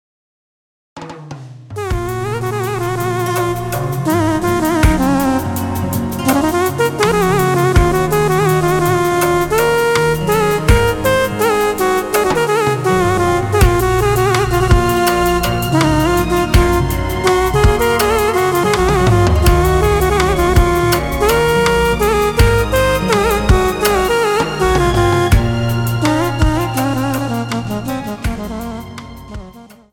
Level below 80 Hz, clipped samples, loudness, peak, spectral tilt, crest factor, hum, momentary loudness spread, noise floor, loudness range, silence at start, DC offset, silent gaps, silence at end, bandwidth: -22 dBFS; under 0.1%; -14 LUFS; 0 dBFS; -5.5 dB/octave; 12 dB; none; 8 LU; -38 dBFS; 5 LU; 0.95 s; under 0.1%; none; 0.25 s; 18 kHz